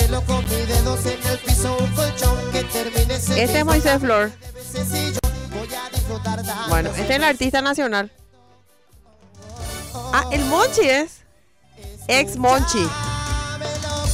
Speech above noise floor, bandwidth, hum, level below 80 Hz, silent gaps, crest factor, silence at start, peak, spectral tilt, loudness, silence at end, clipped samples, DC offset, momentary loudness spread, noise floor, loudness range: 37 dB; 16 kHz; none; -28 dBFS; none; 16 dB; 0 s; -6 dBFS; -4 dB/octave; -20 LUFS; 0 s; under 0.1%; 0.1%; 13 LU; -57 dBFS; 4 LU